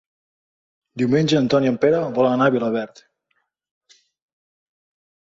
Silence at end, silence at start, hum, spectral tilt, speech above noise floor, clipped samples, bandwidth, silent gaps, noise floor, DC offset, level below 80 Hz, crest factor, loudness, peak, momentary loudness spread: 2.55 s; 0.95 s; none; -6.5 dB/octave; 53 dB; under 0.1%; 7.8 kHz; none; -71 dBFS; under 0.1%; -62 dBFS; 18 dB; -19 LUFS; -4 dBFS; 9 LU